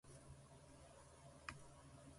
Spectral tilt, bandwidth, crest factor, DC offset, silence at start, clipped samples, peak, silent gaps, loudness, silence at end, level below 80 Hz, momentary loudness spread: -4 dB/octave; 11.5 kHz; 28 dB; under 0.1%; 0.05 s; under 0.1%; -32 dBFS; none; -61 LUFS; 0 s; -70 dBFS; 7 LU